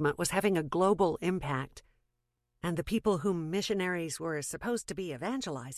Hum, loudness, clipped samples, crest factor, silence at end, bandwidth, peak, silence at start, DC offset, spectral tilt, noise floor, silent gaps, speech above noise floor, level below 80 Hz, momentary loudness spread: none; -32 LUFS; under 0.1%; 18 dB; 0 s; 14.5 kHz; -14 dBFS; 0 s; under 0.1%; -5 dB/octave; -82 dBFS; none; 50 dB; -58 dBFS; 8 LU